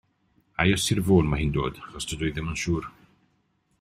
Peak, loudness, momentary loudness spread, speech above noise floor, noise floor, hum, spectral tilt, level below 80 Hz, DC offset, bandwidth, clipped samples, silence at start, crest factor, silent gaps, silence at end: -4 dBFS; -25 LUFS; 13 LU; 45 dB; -70 dBFS; none; -5 dB/octave; -42 dBFS; under 0.1%; 15.5 kHz; under 0.1%; 0.6 s; 22 dB; none; 0.9 s